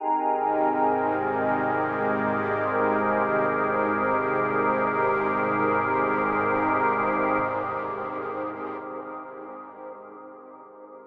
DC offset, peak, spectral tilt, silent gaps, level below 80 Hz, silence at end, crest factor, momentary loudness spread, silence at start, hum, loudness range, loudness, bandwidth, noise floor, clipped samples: under 0.1%; -10 dBFS; -9 dB/octave; none; -62 dBFS; 0 s; 14 dB; 16 LU; 0 s; none; 7 LU; -25 LUFS; 5.6 kHz; -45 dBFS; under 0.1%